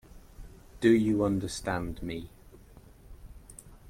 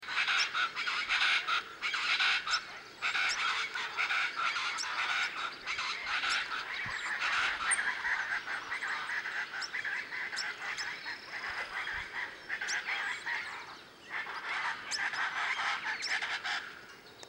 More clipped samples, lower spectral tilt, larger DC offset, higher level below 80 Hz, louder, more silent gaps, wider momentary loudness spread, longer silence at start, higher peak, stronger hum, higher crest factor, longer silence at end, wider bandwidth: neither; first, -6 dB/octave vs 1 dB/octave; neither; first, -50 dBFS vs -70 dBFS; first, -29 LUFS vs -33 LUFS; neither; first, 25 LU vs 10 LU; first, 0.15 s vs 0 s; first, -12 dBFS vs -16 dBFS; neither; about the same, 20 dB vs 18 dB; about the same, 0 s vs 0 s; about the same, 15.5 kHz vs 16 kHz